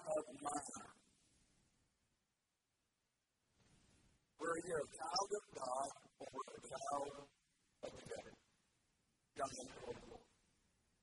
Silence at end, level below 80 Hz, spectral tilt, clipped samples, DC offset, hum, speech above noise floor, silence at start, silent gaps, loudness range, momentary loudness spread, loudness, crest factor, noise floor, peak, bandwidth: 0.8 s; -78 dBFS; -2.5 dB/octave; under 0.1%; under 0.1%; none; 42 dB; 0 s; none; 8 LU; 17 LU; -47 LUFS; 24 dB; -89 dBFS; -26 dBFS; 11.5 kHz